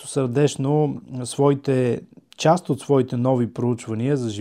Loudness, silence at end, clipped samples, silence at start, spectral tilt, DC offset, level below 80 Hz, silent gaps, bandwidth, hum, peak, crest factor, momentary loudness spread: -22 LUFS; 0 s; under 0.1%; 0 s; -6.5 dB/octave; under 0.1%; -64 dBFS; none; 13.5 kHz; none; -4 dBFS; 18 dB; 6 LU